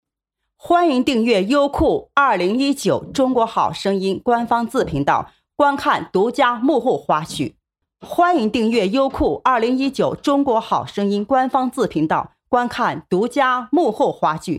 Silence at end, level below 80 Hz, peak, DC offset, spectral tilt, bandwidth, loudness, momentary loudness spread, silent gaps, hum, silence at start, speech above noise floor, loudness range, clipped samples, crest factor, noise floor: 0 s; -44 dBFS; -2 dBFS; under 0.1%; -5.5 dB/octave; 15 kHz; -18 LUFS; 5 LU; none; none; 0.65 s; 61 dB; 2 LU; under 0.1%; 16 dB; -79 dBFS